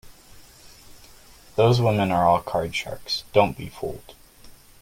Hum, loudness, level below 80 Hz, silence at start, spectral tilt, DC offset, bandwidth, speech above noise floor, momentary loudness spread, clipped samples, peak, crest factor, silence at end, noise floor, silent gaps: none; -23 LUFS; -50 dBFS; 0.05 s; -6 dB/octave; under 0.1%; 16.5 kHz; 27 dB; 14 LU; under 0.1%; -2 dBFS; 22 dB; 0.3 s; -49 dBFS; none